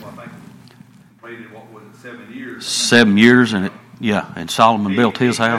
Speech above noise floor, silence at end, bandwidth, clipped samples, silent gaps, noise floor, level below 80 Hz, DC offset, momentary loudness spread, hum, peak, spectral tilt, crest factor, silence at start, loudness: 30 dB; 0 s; 14.5 kHz; under 0.1%; none; -45 dBFS; -58 dBFS; under 0.1%; 26 LU; none; 0 dBFS; -4.5 dB/octave; 18 dB; 0 s; -15 LUFS